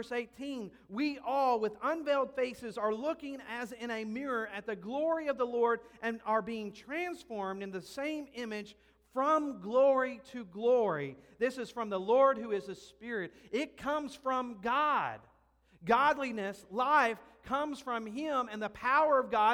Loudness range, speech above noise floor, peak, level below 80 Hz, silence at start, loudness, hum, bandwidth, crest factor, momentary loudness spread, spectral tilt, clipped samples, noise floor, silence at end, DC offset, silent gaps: 4 LU; 34 dB; -14 dBFS; -70 dBFS; 0 s; -33 LUFS; none; 14.5 kHz; 20 dB; 13 LU; -5 dB/octave; under 0.1%; -67 dBFS; 0 s; under 0.1%; none